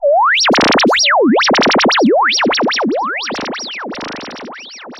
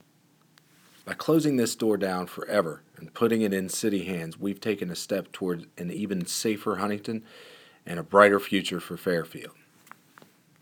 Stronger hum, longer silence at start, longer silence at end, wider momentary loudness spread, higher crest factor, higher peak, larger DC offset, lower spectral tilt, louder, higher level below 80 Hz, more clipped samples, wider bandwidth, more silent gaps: neither; second, 0 s vs 1.05 s; second, 0 s vs 1.15 s; about the same, 16 LU vs 16 LU; second, 8 dB vs 26 dB; about the same, -4 dBFS vs -2 dBFS; neither; second, -2.5 dB/octave vs -4.5 dB/octave; first, -12 LUFS vs -27 LUFS; first, -52 dBFS vs -72 dBFS; neither; second, 12.5 kHz vs over 20 kHz; neither